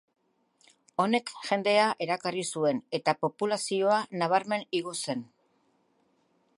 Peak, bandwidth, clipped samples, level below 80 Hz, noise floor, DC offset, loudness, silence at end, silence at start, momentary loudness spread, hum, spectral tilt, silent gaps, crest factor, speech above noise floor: -10 dBFS; 11.5 kHz; under 0.1%; -80 dBFS; -70 dBFS; under 0.1%; -29 LUFS; 1.35 s; 1 s; 8 LU; none; -4 dB/octave; none; 20 dB; 42 dB